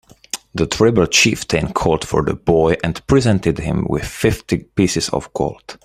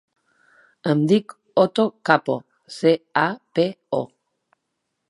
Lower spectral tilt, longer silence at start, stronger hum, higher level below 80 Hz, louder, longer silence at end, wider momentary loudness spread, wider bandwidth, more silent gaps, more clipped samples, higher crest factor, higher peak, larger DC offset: second, -4.5 dB/octave vs -6.5 dB/octave; second, 0.35 s vs 0.85 s; neither; first, -36 dBFS vs -72 dBFS; first, -17 LUFS vs -21 LUFS; second, 0.1 s vs 1.05 s; about the same, 10 LU vs 10 LU; first, 16 kHz vs 11.5 kHz; neither; neither; about the same, 18 dB vs 22 dB; about the same, 0 dBFS vs 0 dBFS; neither